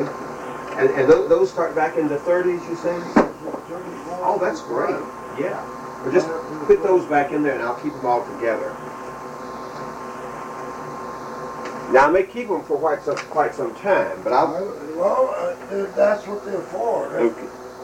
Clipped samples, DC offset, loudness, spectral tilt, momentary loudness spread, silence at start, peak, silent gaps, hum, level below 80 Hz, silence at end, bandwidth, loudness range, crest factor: under 0.1%; under 0.1%; -22 LUFS; -6 dB/octave; 15 LU; 0 s; -2 dBFS; none; none; -54 dBFS; 0 s; 16 kHz; 6 LU; 20 dB